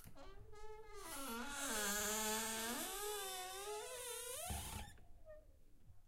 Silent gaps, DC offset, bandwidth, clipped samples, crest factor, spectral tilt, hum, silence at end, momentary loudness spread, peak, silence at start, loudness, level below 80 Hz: none; under 0.1%; 16 kHz; under 0.1%; 18 dB; -1.5 dB/octave; none; 0 s; 21 LU; -28 dBFS; 0 s; -44 LUFS; -60 dBFS